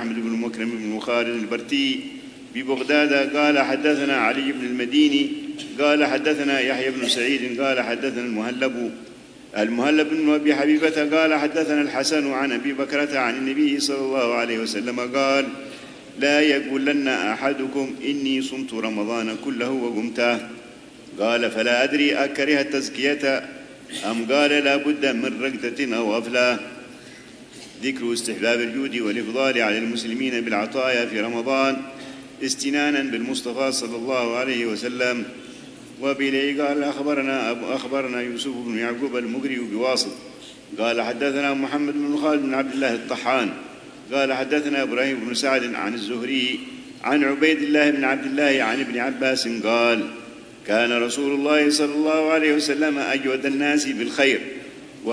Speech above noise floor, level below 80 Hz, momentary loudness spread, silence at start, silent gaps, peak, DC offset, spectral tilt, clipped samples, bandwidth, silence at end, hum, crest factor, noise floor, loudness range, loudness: 21 dB; -66 dBFS; 11 LU; 0 s; none; -4 dBFS; under 0.1%; -3 dB/octave; under 0.1%; 11 kHz; 0 s; none; 18 dB; -43 dBFS; 4 LU; -22 LUFS